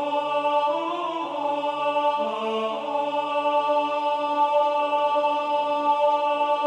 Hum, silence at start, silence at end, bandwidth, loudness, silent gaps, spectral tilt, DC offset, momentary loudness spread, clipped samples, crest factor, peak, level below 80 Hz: none; 0 s; 0 s; 9.4 kHz; -24 LUFS; none; -4 dB/octave; under 0.1%; 5 LU; under 0.1%; 12 dB; -12 dBFS; -84 dBFS